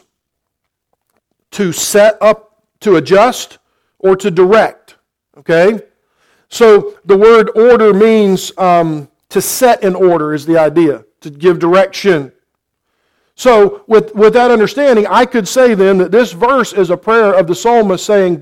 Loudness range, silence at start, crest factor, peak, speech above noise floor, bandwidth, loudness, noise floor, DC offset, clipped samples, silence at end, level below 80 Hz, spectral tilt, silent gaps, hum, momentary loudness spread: 4 LU; 1.55 s; 10 dB; 0 dBFS; 64 dB; 17 kHz; -10 LUFS; -74 dBFS; under 0.1%; under 0.1%; 0 s; -48 dBFS; -5 dB/octave; none; none; 10 LU